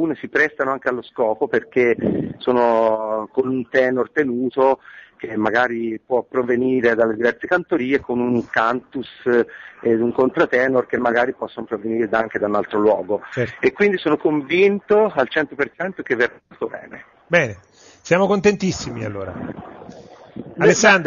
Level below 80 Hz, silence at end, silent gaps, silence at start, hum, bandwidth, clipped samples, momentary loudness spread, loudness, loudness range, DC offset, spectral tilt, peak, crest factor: -56 dBFS; 0 s; none; 0 s; none; 7.2 kHz; under 0.1%; 12 LU; -19 LUFS; 3 LU; under 0.1%; -4 dB/octave; 0 dBFS; 20 dB